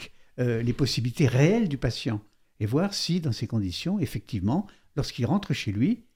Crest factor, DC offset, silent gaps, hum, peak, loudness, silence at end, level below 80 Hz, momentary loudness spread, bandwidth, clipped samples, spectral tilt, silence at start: 18 dB; under 0.1%; none; none; -8 dBFS; -27 LUFS; 0.15 s; -48 dBFS; 10 LU; 16 kHz; under 0.1%; -6 dB/octave; 0 s